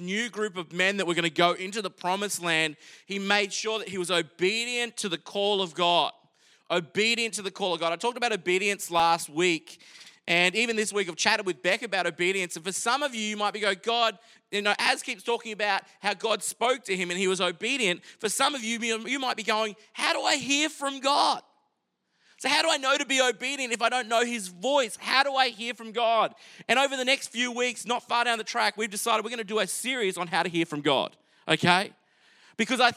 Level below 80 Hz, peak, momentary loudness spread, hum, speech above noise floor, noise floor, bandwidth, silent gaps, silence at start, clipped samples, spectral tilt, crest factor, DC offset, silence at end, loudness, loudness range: -78 dBFS; -4 dBFS; 7 LU; none; 49 dB; -77 dBFS; 16 kHz; none; 0 s; under 0.1%; -2.5 dB/octave; 24 dB; under 0.1%; 0 s; -26 LUFS; 2 LU